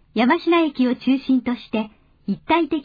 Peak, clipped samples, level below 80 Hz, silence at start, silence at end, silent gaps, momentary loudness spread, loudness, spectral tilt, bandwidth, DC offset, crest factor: -6 dBFS; under 0.1%; -56 dBFS; 0.15 s; 0 s; none; 11 LU; -20 LUFS; -7.5 dB/octave; 5 kHz; under 0.1%; 16 dB